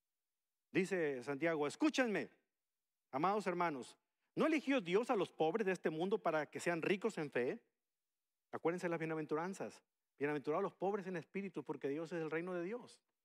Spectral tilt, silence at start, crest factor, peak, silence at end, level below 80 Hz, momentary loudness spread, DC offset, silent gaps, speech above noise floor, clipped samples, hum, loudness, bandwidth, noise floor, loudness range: -5.5 dB/octave; 0.75 s; 20 dB; -20 dBFS; 0.3 s; under -90 dBFS; 10 LU; under 0.1%; none; over 51 dB; under 0.1%; none; -40 LUFS; 13.5 kHz; under -90 dBFS; 5 LU